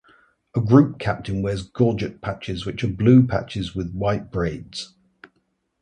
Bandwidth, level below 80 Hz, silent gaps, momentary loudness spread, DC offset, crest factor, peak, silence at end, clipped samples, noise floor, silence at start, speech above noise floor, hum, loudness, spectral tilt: 9.8 kHz; -44 dBFS; none; 14 LU; under 0.1%; 20 dB; -2 dBFS; 0.95 s; under 0.1%; -70 dBFS; 0.55 s; 49 dB; none; -22 LUFS; -8 dB/octave